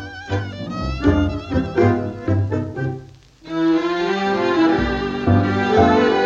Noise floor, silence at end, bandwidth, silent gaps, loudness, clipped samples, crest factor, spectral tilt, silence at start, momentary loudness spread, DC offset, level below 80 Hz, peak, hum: -41 dBFS; 0 s; 7.4 kHz; none; -19 LUFS; under 0.1%; 16 dB; -7.5 dB/octave; 0 s; 11 LU; under 0.1%; -36 dBFS; -2 dBFS; none